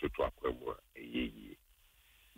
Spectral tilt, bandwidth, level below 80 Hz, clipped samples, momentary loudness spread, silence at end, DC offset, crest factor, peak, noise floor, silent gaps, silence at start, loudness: -6.5 dB/octave; 16 kHz; -54 dBFS; under 0.1%; 18 LU; 0.8 s; under 0.1%; 20 dB; -20 dBFS; -67 dBFS; none; 0 s; -40 LUFS